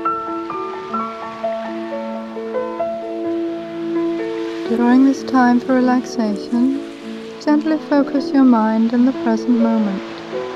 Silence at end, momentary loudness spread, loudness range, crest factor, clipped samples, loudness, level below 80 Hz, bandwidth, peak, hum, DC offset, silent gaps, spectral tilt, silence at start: 0 s; 12 LU; 8 LU; 16 dB; under 0.1%; -18 LUFS; -62 dBFS; 7.8 kHz; -2 dBFS; none; under 0.1%; none; -6.5 dB/octave; 0 s